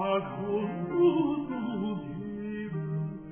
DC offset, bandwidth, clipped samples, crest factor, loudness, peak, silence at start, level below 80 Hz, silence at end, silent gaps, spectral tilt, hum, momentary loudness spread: under 0.1%; 3.4 kHz; under 0.1%; 16 dB; -31 LUFS; -14 dBFS; 0 s; -60 dBFS; 0 s; none; -11.5 dB/octave; none; 11 LU